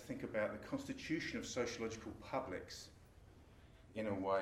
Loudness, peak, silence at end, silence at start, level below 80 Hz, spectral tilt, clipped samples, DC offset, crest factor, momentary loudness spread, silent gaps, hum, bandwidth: -44 LUFS; -26 dBFS; 0 s; 0 s; -66 dBFS; -4.5 dB/octave; under 0.1%; under 0.1%; 18 dB; 22 LU; none; none; 16 kHz